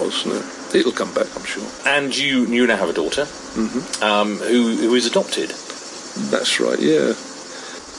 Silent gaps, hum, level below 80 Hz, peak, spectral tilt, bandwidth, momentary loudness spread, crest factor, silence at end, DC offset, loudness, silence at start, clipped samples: none; none; -56 dBFS; -4 dBFS; -3 dB/octave; 11.5 kHz; 12 LU; 16 dB; 0 s; under 0.1%; -19 LUFS; 0 s; under 0.1%